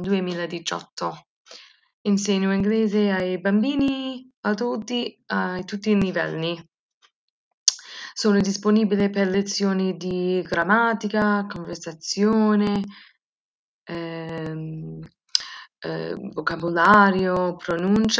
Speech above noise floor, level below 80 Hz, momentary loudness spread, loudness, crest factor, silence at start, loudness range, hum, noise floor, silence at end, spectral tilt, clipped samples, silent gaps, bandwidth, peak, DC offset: 26 dB; -56 dBFS; 13 LU; -23 LUFS; 22 dB; 0 s; 5 LU; none; -48 dBFS; 0 s; -4.5 dB/octave; under 0.1%; 0.92-0.97 s, 1.26-1.45 s, 1.93-2.05 s, 4.37-4.43 s, 6.79-7.01 s, 7.15-7.66 s, 13.24-13.86 s; 8 kHz; 0 dBFS; under 0.1%